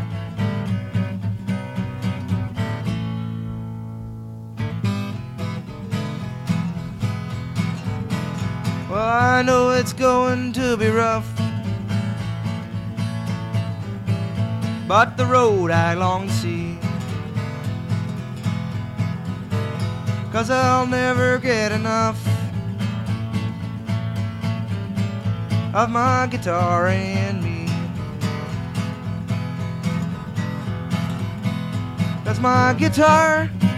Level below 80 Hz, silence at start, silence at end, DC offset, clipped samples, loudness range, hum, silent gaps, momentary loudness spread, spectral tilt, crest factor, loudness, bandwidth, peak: -48 dBFS; 0 s; 0 s; under 0.1%; under 0.1%; 8 LU; none; none; 11 LU; -6.5 dB/octave; 18 dB; -22 LUFS; 13.5 kHz; -2 dBFS